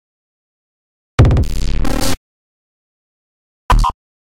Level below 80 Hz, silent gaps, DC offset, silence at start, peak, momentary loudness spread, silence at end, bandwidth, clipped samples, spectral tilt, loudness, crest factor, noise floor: -20 dBFS; 2.17-3.69 s; under 0.1%; 1.2 s; -2 dBFS; 9 LU; 0.4 s; 16.5 kHz; under 0.1%; -5.5 dB/octave; -17 LUFS; 16 dB; under -90 dBFS